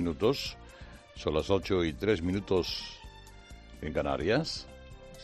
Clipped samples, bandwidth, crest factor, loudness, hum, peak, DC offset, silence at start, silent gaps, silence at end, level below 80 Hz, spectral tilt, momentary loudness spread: under 0.1%; 13 kHz; 20 dB; -31 LUFS; none; -12 dBFS; under 0.1%; 0 s; none; 0 s; -50 dBFS; -5.5 dB/octave; 21 LU